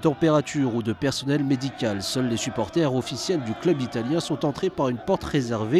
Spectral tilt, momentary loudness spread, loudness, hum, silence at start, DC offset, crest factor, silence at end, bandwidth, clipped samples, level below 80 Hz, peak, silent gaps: -5.5 dB/octave; 4 LU; -25 LUFS; none; 0 s; under 0.1%; 16 dB; 0 s; 14 kHz; under 0.1%; -52 dBFS; -8 dBFS; none